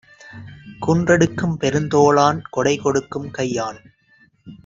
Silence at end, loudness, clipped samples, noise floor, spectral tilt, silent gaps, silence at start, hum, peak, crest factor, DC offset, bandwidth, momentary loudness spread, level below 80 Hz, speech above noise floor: 0.1 s; -19 LUFS; under 0.1%; -56 dBFS; -5.5 dB/octave; none; 0.25 s; none; -2 dBFS; 18 dB; under 0.1%; 7.8 kHz; 19 LU; -52 dBFS; 38 dB